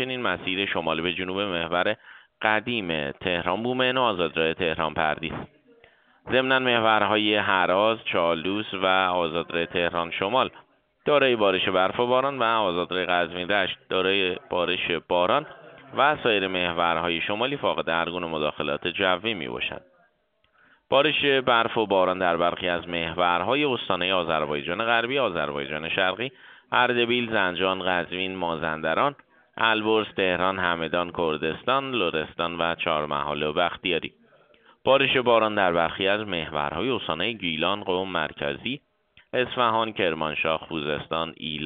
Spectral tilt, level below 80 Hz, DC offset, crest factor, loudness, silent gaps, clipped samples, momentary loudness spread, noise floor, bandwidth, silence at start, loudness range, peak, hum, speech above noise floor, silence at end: -1.5 dB/octave; -58 dBFS; under 0.1%; 22 dB; -24 LUFS; none; under 0.1%; 8 LU; -68 dBFS; 4.7 kHz; 0 s; 3 LU; -4 dBFS; none; 43 dB; 0 s